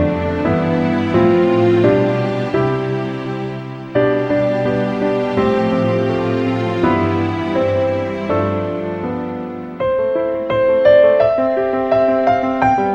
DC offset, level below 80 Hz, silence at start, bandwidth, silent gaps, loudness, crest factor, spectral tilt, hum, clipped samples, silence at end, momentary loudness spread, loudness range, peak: under 0.1%; -44 dBFS; 0 s; 8 kHz; none; -16 LUFS; 16 dB; -8.5 dB/octave; none; under 0.1%; 0 s; 9 LU; 4 LU; 0 dBFS